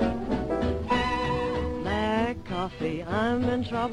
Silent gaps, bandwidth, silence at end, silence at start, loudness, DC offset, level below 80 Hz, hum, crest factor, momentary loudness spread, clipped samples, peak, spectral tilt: none; 10.5 kHz; 0 s; 0 s; -28 LUFS; under 0.1%; -40 dBFS; none; 16 dB; 5 LU; under 0.1%; -12 dBFS; -6.5 dB/octave